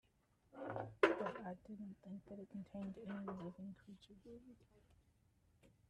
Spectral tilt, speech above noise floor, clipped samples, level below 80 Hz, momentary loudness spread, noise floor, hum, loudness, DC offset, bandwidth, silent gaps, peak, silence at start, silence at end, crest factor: -6.5 dB/octave; 25 dB; under 0.1%; -76 dBFS; 23 LU; -77 dBFS; none; -46 LUFS; under 0.1%; 11.5 kHz; none; -16 dBFS; 0.55 s; 0.2 s; 30 dB